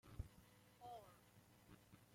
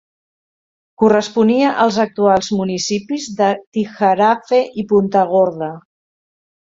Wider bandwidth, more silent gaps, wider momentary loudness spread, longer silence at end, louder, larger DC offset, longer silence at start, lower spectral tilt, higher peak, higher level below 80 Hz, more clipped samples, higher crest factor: first, 16.5 kHz vs 7.8 kHz; second, none vs 3.67-3.72 s; first, 11 LU vs 8 LU; second, 0 s vs 0.9 s; second, -62 LUFS vs -16 LUFS; neither; second, 0.05 s vs 1 s; about the same, -5.5 dB/octave vs -5 dB/octave; second, -36 dBFS vs -2 dBFS; second, -66 dBFS vs -56 dBFS; neither; first, 24 dB vs 14 dB